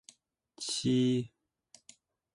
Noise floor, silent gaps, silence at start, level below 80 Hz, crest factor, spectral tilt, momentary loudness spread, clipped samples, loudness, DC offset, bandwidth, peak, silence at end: -64 dBFS; none; 0.6 s; -70 dBFS; 16 dB; -5 dB/octave; 13 LU; under 0.1%; -31 LUFS; under 0.1%; 11.5 kHz; -20 dBFS; 1.1 s